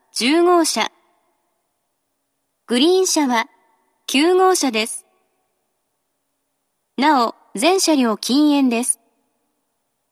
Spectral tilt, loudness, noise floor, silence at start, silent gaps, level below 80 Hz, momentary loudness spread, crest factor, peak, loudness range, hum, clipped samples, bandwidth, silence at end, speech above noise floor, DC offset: -2 dB/octave; -17 LUFS; -72 dBFS; 0.15 s; none; -84 dBFS; 10 LU; 18 dB; -2 dBFS; 3 LU; none; under 0.1%; 14.5 kHz; 1.2 s; 56 dB; under 0.1%